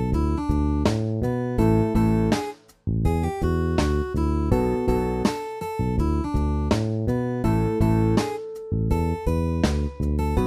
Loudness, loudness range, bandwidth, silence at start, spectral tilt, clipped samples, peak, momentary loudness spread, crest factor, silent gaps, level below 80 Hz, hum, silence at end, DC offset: -24 LUFS; 1 LU; 14.5 kHz; 0 s; -7.5 dB/octave; under 0.1%; -6 dBFS; 6 LU; 16 dB; none; -30 dBFS; none; 0 s; under 0.1%